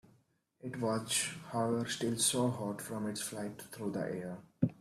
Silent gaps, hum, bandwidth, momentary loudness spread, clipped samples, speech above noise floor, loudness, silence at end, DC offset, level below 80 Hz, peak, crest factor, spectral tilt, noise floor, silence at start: none; none; 15.5 kHz; 12 LU; under 0.1%; 35 dB; -36 LUFS; 0.05 s; under 0.1%; -72 dBFS; -14 dBFS; 22 dB; -4 dB/octave; -71 dBFS; 0.65 s